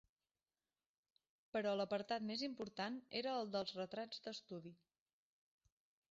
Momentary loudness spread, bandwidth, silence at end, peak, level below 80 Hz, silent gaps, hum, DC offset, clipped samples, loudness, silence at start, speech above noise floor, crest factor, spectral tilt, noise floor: 10 LU; 7.6 kHz; 1.35 s; -28 dBFS; -86 dBFS; none; none; under 0.1%; under 0.1%; -45 LUFS; 1.55 s; over 45 dB; 20 dB; -3 dB/octave; under -90 dBFS